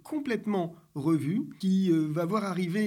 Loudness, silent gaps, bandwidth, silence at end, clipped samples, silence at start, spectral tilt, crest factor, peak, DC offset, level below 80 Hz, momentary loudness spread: -29 LUFS; none; 14.5 kHz; 0 s; under 0.1%; 0.05 s; -7.5 dB/octave; 12 dB; -16 dBFS; under 0.1%; -74 dBFS; 7 LU